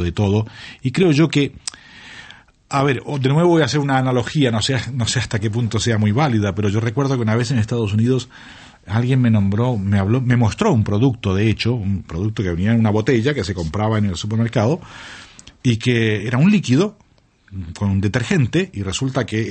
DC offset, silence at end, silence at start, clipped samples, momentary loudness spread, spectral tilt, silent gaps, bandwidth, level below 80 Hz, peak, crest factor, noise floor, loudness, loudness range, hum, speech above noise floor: under 0.1%; 0 s; 0 s; under 0.1%; 9 LU; -6.5 dB/octave; none; 8.8 kHz; -44 dBFS; -2 dBFS; 16 dB; -44 dBFS; -18 LUFS; 2 LU; none; 27 dB